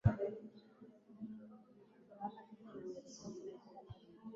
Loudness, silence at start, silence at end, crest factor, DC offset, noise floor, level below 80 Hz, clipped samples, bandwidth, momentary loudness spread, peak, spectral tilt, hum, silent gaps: -49 LUFS; 0.05 s; 0 s; 26 dB; under 0.1%; -65 dBFS; -58 dBFS; under 0.1%; 7.4 kHz; 17 LU; -18 dBFS; -8.5 dB/octave; none; none